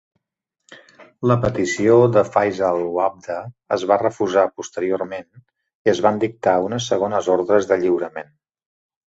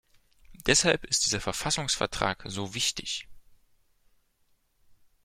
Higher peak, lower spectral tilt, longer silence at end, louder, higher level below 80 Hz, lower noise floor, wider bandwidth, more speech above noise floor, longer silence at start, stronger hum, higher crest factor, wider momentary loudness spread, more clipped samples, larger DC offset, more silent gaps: first, -2 dBFS vs -8 dBFS; first, -6 dB/octave vs -2 dB/octave; first, 0.9 s vs 0.3 s; first, -19 LUFS vs -27 LUFS; about the same, -54 dBFS vs -52 dBFS; first, -80 dBFS vs -69 dBFS; second, 8 kHz vs 16.5 kHz; first, 62 dB vs 41 dB; first, 0.7 s vs 0.5 s; neither; second, 18 dB vs 24 dB; about the same, 11 LU vs 12 LU; neither; neither; first, 5.75-5.85 s vs none